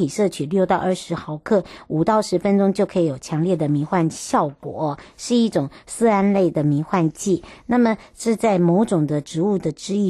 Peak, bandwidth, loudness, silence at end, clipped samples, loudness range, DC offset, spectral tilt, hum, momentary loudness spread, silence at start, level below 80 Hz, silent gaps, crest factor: -6 dBFS; 12.5 kHz; -20 LUFS; 0 s; under 0.1%; 2 LU; under 0.1%; -6.5 dB/octave; none; 8 LU; 0 s; -54 dBFS; none; 14 dB